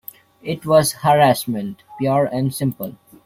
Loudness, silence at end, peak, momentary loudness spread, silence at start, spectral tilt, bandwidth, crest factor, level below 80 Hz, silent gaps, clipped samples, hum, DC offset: -18 LUFS; 0.35 s; -2 dBFS; 17 LU; 0.45 s; -5.5 dB/octave; 16.5 kHz; 18 dB; -56 dBFS; none; under 0.1%; none; under 0.1%